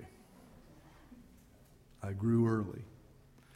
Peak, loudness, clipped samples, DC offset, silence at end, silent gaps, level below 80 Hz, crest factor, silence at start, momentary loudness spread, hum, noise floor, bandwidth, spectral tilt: -20 dBFS; -34 LUFS; under 0.1%; under 0.1%; 0.65 s; none; -64 dBFS; 18 dB; 0 s; 28 LU; none; -62 dBFS; 12.5 kHz; -9 dB/octave